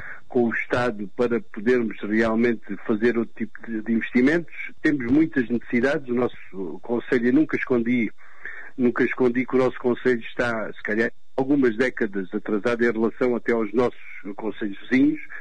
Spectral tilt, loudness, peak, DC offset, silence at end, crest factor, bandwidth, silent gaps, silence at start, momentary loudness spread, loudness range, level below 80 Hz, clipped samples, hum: -7 dB/octave; -23 LUFS; -10 dBFS; 2%; 0 s; 14 dB; 9.4 kHz; none; 0 s; 10 LU; 1 LU; -56 dBFS; under 0.1%; none